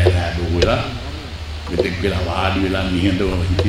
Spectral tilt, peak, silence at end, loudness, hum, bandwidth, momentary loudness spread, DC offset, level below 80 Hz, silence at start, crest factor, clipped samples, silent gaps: -6.5 dB/octave; 0 dBFS; 0 s; -20 LUFS; none; 12.5 kHz; 12 LU; under 0.1%; -28 dBFS; 0 s; 18 dB; under 0.1%; none